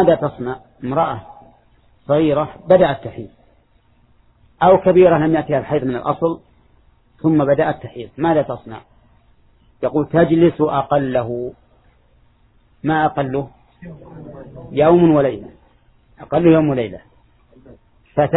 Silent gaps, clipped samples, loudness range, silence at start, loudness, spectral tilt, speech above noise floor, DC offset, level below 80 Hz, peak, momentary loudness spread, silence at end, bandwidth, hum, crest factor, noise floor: none; under 0.1%; 5 LU; 0 s; -17 LUFS; -12 dB/octave; 39 dB; under 0.1%; -48 dBFS; 0 dBFS; 22 LU; 0 s; 4.1 kHz; none; 18 dB; -55 dBFS